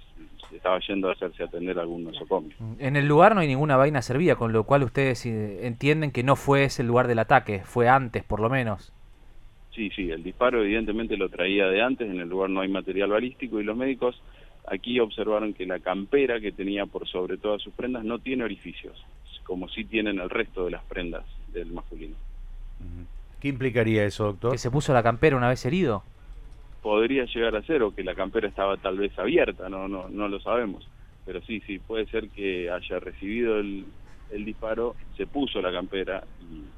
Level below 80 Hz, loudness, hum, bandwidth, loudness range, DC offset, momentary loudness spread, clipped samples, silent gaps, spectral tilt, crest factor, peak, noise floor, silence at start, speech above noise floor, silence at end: -44 dBFS; -26 LUFS; none; 14 kHz; 9 LU; under 0.1%; 16 LU; under 0.1%; none; -6.5 dB/octave; 24 dB; -4 dBFS; -47 dBFS; 0 s; 21 dB; 0 s